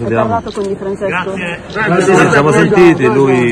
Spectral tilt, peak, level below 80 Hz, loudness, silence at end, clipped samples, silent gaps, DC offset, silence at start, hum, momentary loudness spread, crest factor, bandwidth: -6 dB/octave; 0 dBFS; -40 dBFS; -11 LUFS; 0 s; under 0.1%; none; under 0.1%; 0 s; none; 11 LU; 10 dB; 10.5 kHz